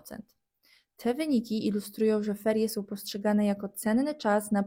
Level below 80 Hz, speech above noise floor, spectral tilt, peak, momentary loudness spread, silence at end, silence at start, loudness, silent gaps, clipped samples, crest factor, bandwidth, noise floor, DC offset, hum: -68 dBFS; 38 dB; -5.5 dB/octave; -14 dBFS; 8 LU; 0 s; 0.05 s; -29 LUFS; none; under 0.1%; 16 dB; 16.5 kHz; -66 dBFS; under 0.1%; none